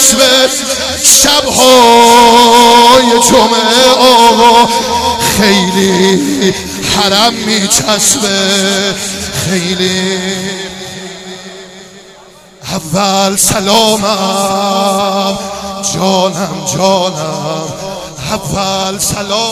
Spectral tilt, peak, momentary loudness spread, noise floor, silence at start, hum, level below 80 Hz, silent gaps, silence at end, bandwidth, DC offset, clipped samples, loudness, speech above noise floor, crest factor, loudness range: -2.5 dB/octave; 0 dBFS; 15 LU; -37 dBFS; 0 s; none; -38 dBFS; none; 0 s; over 20 kHz; under 0.1%; 2%; -8 LUFS; 28 dB; 10 dB; 11 LU